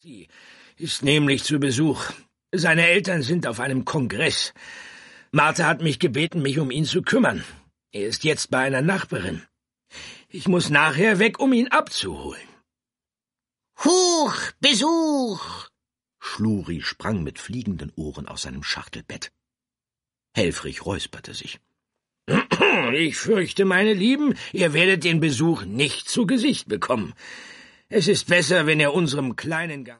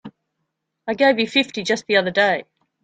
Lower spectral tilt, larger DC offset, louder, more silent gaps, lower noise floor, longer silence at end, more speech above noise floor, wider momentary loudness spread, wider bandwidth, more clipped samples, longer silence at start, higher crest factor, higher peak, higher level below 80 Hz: about the same, -4 dB/octave vs -4 dB/octave; neither; about the same, -21 LUFS vs -19 LUFS; neither; first, under -90 dBFS vs -76 dBFS; second, 0.05 s vs 0.4 s; first, over 68 dB vs 58 dB; first, 17 LU vs 10 LU; first, 11.5 kHz vs 9.2 kHz; neither; about the same, 0.05 s vs 0.05 s; about the same, 20 dB vs 18 dB; about the same, -2 dBFS vs -2 dBFS; first, -54 dBFS vs -66 dBFS